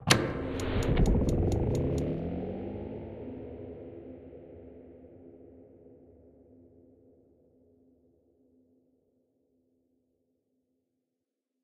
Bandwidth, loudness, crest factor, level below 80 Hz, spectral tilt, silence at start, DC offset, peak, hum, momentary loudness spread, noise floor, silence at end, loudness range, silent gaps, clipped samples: 15 kHz; -31 LUFS; 30 dB; -40 dBFS; -5 dB/octave; 0 s; under 0.1%; -4 dBFS; none; 25 LU; -86 dBFS; 5.7 s; 25 LU; none; under 0.1%